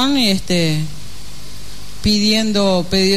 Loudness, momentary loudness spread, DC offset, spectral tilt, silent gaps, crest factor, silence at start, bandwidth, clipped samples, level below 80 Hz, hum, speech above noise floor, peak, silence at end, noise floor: -16 LUFS; 21 LU; 7%; -4.5 dB/octave; none; 12 dB; 0 s; 13.5 kHz; under 0.1%; -38 dBFS; 50 Hz at -35 dBFS; 20 dB; -4 dBFS; 0 s; -35 dBFS